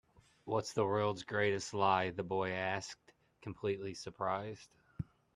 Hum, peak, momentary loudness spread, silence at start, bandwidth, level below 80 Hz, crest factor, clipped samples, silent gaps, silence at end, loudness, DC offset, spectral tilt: none; -18 dBFS; 17 LU; 0.45 s; 11.5 kHz; -68 dBFS; 20 dB; under 0.1%; none; 0.3 s; -36 LUFS; under 0.1%; -5 dB/octave